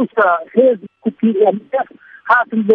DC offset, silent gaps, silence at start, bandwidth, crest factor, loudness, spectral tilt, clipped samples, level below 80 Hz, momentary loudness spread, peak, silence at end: under 0.1%; none; 0 s; 4.7 kHz; 14 dB; -15 LUFS; -9 dB/octave; under 0.1%; -64 dBFS; 10 LU; 0 dBFS; 0 s